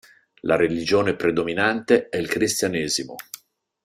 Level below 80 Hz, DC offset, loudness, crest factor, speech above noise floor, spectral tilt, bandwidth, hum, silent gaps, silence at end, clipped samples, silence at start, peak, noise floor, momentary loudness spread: -58 dBFS; under 0.1%; -22 LUFS; 20 dB; 25 dB; -4 dB/octave; 16 kHz; none; none; 0.5 s; under 0.1%; 0.45 s; -2 dBFS; -46 dBFS; 14 LU